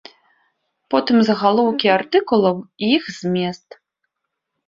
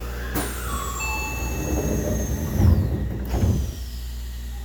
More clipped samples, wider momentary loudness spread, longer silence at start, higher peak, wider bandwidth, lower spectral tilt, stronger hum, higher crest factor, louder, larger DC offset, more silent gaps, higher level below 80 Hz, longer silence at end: neither; second, 7 LU vs 14 LU; first, 0.9 s vs 0 s; first, -2 dBFS vs -6 dBFS; second, 7.6 kHz vs over 20 kHz; about the same, -6 dB/octave vs -5.5 dB/octave; second, none vs 60 Hz at -30 dBFS; about the same, 18 dB vs 18 dB; first, -18 LUFS vs -25 LUFS; neither; neither; second, -64 dBFS vs -28 dBFS; first, 1.1 s vs 0 s